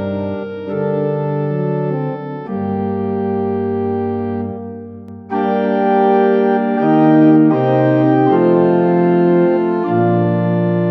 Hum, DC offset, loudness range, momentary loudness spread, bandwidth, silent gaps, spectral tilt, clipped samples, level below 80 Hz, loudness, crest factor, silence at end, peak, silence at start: none; under 0.1%; 8 LU; 11 LU; 5.6 kHz; none; -11 dB/octave; under 0.1%; -62 dBFS; -15 LUFS; 14 dB; 0 s; -2 dBFS; 0 s